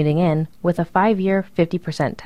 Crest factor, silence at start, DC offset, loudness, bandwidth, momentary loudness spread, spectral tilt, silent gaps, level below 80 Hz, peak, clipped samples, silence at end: 16 dB; 0 s; 0.6%; -20 LUFS; 11 kHz; 5 LU; -8 dB/octave; none; -50 dBFS; -4 dBFS; under 0.1%; 0 s